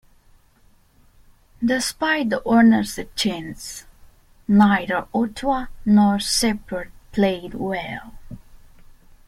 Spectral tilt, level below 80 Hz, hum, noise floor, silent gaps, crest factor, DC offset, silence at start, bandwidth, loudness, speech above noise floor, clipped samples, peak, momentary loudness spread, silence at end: -4.5 dB/octave; -46 dBFS; none; -55 dBFS; none; 18 dB; under 0.1%; 1.6 s; 15 kHz; -20 LUFS; 36 dB; under 0.1%; -4 dBFS; 17 LU; 0.7 s